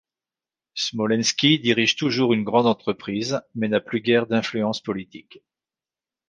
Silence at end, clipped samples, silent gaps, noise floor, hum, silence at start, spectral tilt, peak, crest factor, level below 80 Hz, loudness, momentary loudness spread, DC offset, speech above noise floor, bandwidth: 1.1 s; under 0.1%; none; under -90 dBFS; none; 0.75 s; -4 dB/octave; -4 dBFS; 18 dB; -64 dBFS; -22 LUFS; 10 LU; under 0.1%; over 68 dB; 9.6 kHz